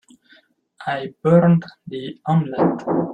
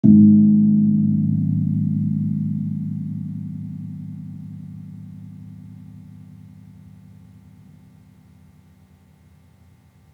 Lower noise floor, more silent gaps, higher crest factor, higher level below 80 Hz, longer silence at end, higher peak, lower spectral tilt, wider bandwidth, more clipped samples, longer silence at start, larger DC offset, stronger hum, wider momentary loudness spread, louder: about the same, -55 dBFS vs -52 dBFS; neither; about the same, 18 dB vs 20 dB; about the same, -60 dBFS vs -64 dBFS; second, 0 s vs 3.95 s; about the same, -2 dBFS vs -2 dBFS; second, -9.5 dB/octave vs -13 dB/octave; first, 4.9 kHz vs 0.9 kHz; neither; first, 0.8 s vs 0.05 s; neither; neither; second, 17 LU vs 26 LU; about the same, -19 LUFS vs -19 LUFS